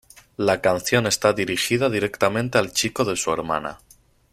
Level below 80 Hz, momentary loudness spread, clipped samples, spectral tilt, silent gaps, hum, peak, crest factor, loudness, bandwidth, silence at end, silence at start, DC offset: -54 dBFS; 6 LU; under 0.1%; -3.5 dB/octave; none; none; -2 dBFS; 20 dB; -21 LUFS; 16 kHz; 0.55 s; 0.4 s; under 0.1%